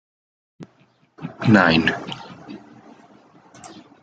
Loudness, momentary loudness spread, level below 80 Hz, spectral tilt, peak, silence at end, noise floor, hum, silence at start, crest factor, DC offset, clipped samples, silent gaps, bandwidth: -17 LUFS; 28 LU; -56 dBFS; -6.5 dB/octave; -2 dBFS; 0.35 s; -59 dBFS; none; 0.6 s; 22 dB; under 0.1%; under 0.1%; none; 9 kHz